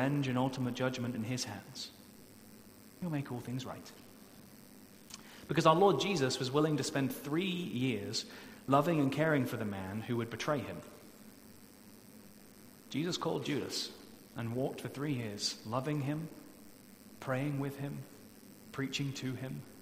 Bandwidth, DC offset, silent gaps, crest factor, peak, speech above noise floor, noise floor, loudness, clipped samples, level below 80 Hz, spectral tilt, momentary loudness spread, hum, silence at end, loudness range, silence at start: 16 kHz; under 0.1%; none; 24 dB; -12 dBFS; 22 dB; -56 dBFS; -35 LUFS; under 0.1%; -70 dBFS; -5.5 dB/octave; 25 LU; none; 0 s; 10 LU; 0 s